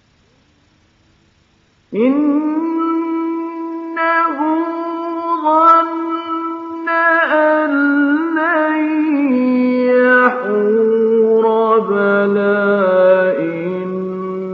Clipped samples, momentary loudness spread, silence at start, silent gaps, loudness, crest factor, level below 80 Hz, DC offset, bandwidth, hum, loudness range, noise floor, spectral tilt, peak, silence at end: under 0.1%; 11 LU; 1.9 s; none; -15 LUFS; 14 dB; -66 dBFS; under 0.1%; 5.8 kHz; none; 5 LU; -55 dBFS; -4.5 dB/octave; 0 dBFS; 0 s